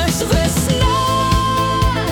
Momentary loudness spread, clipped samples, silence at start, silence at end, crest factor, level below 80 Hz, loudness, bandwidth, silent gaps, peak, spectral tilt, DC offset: 1 LU; under 0.1%; 0 s; 0 s; 12 dB; -24 dBFS; -16 LUFS; 18 kHz; none; -4 dBFS; -4.5 dB/octave; under 0.1%